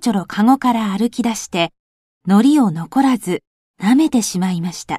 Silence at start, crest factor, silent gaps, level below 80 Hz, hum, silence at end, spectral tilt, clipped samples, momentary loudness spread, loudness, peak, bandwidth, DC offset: 0 s; 16 dB; 1.80-2.21 s, 3.47-3.74 s; -56 dBFS; none; 0 s; -5 dB/octave; under 0.1%; 9 LU; -17 LUFS; -2 dBFS; 14 kHz; under 0.1%